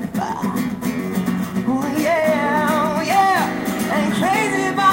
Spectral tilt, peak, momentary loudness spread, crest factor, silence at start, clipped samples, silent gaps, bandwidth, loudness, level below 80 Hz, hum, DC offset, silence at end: -5 dB/octave; -4 dBFS; 6 LU; 16 dB; 0 s; under 0.1%; none; 17 kHz; -19 LUFS; -52 dBFS; none; under 0.1%; 0 s